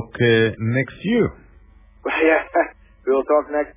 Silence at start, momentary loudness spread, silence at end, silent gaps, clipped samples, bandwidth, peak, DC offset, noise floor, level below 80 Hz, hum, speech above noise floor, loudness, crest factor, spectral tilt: 0 s; 8 LU; 0.05 s; none; under 0.1%; 3.8 kHz; -4 dBFS; under 0.1%; -48 dBFS; -48 dBFS; none; 30 dB; -20 LUFS; 16 dB; -10.5 dB/octave